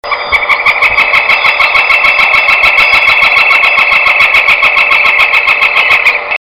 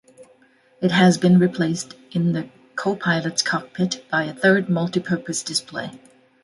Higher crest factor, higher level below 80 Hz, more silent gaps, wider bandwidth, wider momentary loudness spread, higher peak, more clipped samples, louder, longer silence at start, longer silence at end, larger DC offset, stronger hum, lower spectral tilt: second, 8 dB vs 18 dB; first, -38 dBFS vs -64 dBFS; neither; first, over 20 kHz vs 11.5 kHz; second, 2 LU vs 12 LU; first, 0 dBFS vs -4 dBFS; first, 0.8% vs under 0.1%; first, -5 LUFS vs -21 LUFS; second, 0.05 s vs 0.2 s; second, 0.15 s vs 0.45 s; first, 0.4% vs under 0.1%; neither; second, -1 dB/octave vs -5 dB/octave